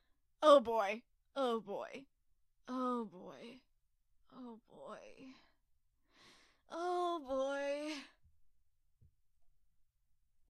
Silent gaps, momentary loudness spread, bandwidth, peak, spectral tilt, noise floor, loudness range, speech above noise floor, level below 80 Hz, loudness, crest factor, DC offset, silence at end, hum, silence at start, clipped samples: none; 26 LU; 12 kHz; -16 dBFS; -4 dB/octave; -76 dBFS; 20 LU; 39 dB; -76 dBFS; -36 LUFS; 26 dB; under 0.1%; 2.45 s; none; 0.4 s; under 0.1%